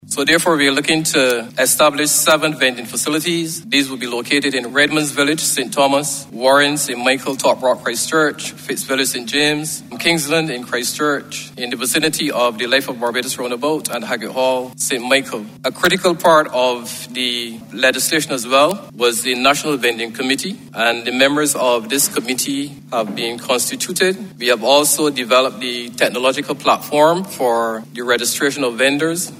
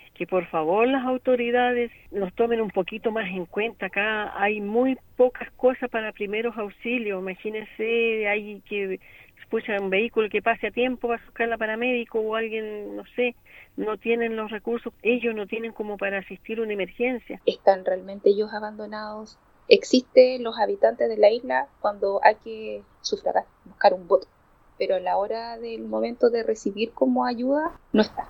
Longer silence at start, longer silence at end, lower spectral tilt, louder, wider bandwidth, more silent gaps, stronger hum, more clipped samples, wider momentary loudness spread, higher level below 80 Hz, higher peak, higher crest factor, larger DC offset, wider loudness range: second, 0.05 s vs 0.2 s; about the same, 0 s vs 0 s; second, -2.5 dB/octave vs -5 dB/octave; first, -16 LUFS vs -25 LUFS; about the same, 16 kHz vs 17 kHz; neither; neither; neither; second, 9 LU vs 12 LU; about the same, -60 dBFS vs -58 dBFS; about the same, 0 dBFS vs 0 dBFS; second, 16 dB vs 24 dB; neither; second, 3 LU vs 6 LU